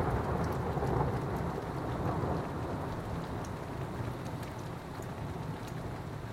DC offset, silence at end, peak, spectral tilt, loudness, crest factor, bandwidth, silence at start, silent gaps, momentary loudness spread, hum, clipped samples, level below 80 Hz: under 0.1%; 0 s; -18 dBFS; -7.5 dB/octave; -37 LUFS; 16 dB; 16 kHz; 0 s; none; 8 LU; none; under 0.1%; -48 dBFS